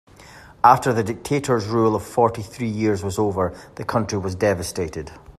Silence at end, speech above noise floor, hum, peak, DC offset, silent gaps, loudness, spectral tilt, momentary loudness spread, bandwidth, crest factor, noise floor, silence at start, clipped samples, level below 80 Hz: 0.1 s; 24 dB; none; 0 dBFS; under 0.1%; none; -21 LUFS; -6 dB/octave; 11 LU; 14.5 kHz; 22 dB; -45 dBFS; 0.2 s; under 0.1%; -50 dBFS